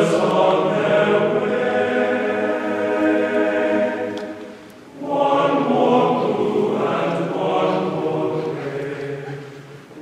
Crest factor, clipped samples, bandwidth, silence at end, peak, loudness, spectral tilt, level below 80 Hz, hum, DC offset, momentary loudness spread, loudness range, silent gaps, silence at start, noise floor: 14 dB; under 0.1%; 12.5 kHz; 0 s; -4 dBFS; -19 LUFS; -6.5 dB/octave; -66 dBFS; none; under 0.1%; 15 LU; 3 LU; none; 0 s; -39 dBFS